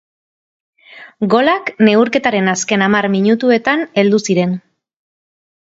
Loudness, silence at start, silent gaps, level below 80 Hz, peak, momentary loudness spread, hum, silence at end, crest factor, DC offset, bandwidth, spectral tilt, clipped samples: -14 LUFS; 0.95 s; none; -60 dBFS; 0 dBFS; 4 LU; none; 1.15 s; 16 dB; under 0.1%; 7.8 kHz; -5 dB/octave; under 0.1%